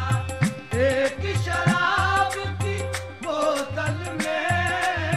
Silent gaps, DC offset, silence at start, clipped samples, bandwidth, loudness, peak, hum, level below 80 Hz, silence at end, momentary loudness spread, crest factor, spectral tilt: none; 0.3%; 0 s; under 0.1%; 15 kHz; -24 LUFS; -8 dBFS; none; -44 dBFS; 0 s; 7 LU; 16 dB; -5 dB/octave